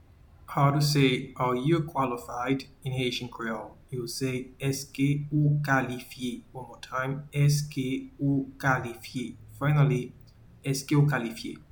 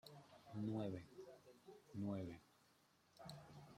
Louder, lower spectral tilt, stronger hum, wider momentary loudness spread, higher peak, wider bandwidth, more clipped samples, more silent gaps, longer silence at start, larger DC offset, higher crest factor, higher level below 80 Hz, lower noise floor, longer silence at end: first, -28 LUFS vs -51 LUFS; second, -6 dB/octave vs -7.5 dB/octave; neither; second, 12 LU vs 17 LU; first, -10 dBFS vs -34 dBFS; first, 19 kHz vs 15.5 kHz; neither; neither; first, 0.5 s vs 0.05 s; neither; about the same, 18 dB vs 18 dB; first, -56 dBFS vs -82 dBFS; second, -52 dBFS vs -76 dBFS; first, 0.15 s vs 0 s